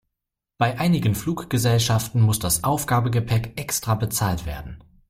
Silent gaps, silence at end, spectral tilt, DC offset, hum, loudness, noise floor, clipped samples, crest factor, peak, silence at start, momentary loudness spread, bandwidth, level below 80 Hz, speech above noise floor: none; 0.3 s; -5 dB/octave; under 0.1%; none; -22 LUFS; -84 dBFS; under 0.1%; 16 dB; -8 dBFS; 0.6 s; 7 LU; 16.5 kHz; -42 dBFS; 63 dB